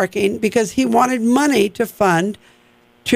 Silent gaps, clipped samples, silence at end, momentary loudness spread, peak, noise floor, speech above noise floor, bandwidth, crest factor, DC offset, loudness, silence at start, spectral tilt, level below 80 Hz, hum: none; under 0.1%; 0 s; 8 LU; -2 dBFS; -53 dBFS; 36 dB; 16 kHz; 14 dB; under 0.1%; -17 LUFS; 0 s; -4.5 dB/octave; -54 dBFS; none